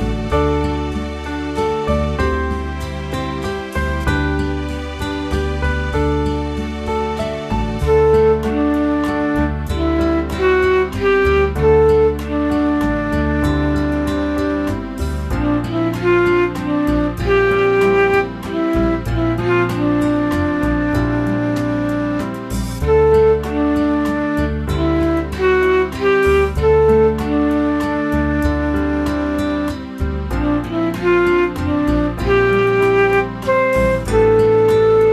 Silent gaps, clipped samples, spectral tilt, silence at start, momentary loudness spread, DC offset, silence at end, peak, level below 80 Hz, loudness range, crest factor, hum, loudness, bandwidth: none; under 0.1%; -7 dB/octave; 0 s; 9 LU; under 0.1%; 0 s; -2 dBFS; -26 dBFS; 5 LU; 14 dB; none; -17 LUFS; 14 kHz